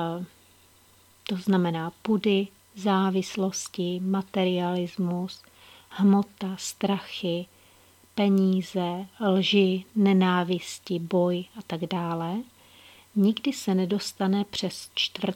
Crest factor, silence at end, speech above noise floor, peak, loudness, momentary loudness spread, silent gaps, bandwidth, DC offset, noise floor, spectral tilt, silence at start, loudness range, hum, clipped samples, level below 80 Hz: 18 dB; 0 s; 32 dB; -8 dBFS; -26 LUFS; 12 LU; none; 16 kHz; under 0.1%; -58 dBFS; -5.5 dB/octave; 0 s; 4 LU; none; under 0.1%; -70 dBFS